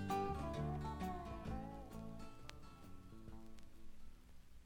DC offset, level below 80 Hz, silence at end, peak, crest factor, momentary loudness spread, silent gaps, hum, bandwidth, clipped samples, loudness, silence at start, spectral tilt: under 0.1%; -56 dBFS; 0 s; -28 dBFS; 20 dB; 21 LU; none; none; 17.5 kHz; under 0.1%; -48 LUFS; 0 s; -7 dB/octave